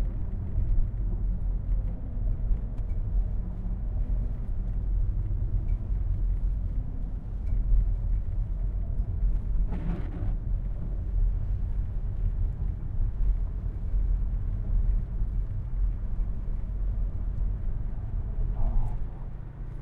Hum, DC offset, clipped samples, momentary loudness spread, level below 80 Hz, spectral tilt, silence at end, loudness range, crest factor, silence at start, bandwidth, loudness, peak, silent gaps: none; under 0.1%; under 0.1%; 4 LU; -28 dBFS; -11 dB/octave; 0 s; 2 LU; 14 dB; 0 s; 2.3 kHz; -33 LUFS; -14 dBFS; none